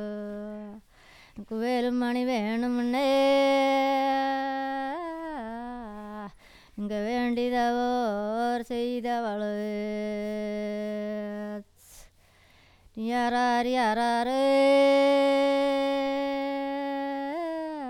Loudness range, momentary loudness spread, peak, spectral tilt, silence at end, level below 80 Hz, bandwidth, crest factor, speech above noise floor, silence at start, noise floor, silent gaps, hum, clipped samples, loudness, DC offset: 9 LU; 16 LU; -14 dBFS; -5 dB/octave; 0 s; -60 dBFS; 16 kHz; 14 dB; 33 dB; 0 s; -59 dBFS; none; none; under 0.1%; -27 LUFS; under 0.1%